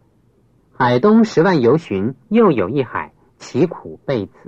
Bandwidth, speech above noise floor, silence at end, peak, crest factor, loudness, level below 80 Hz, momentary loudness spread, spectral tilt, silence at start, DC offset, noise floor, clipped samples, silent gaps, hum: 7.8 kHz; 40 dB; 0.2 s; -2 dBFS; 14 dB; -16 LUFS; -56 dBFS; 12 LU; -7.5 dB/octave; 0.8 s; under 0.1%; -56 dBFS; under 0.1%; none; none